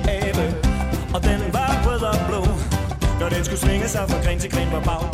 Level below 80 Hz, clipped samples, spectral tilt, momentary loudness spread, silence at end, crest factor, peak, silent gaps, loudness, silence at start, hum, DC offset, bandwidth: -24 dBFS; under 0.1%; -5.5 dB/octave; 3 LU; 0 s; 16 dB; -4 dBFS; none; -22 LUFS; 0 s; none; under 0.1%; 16 kHz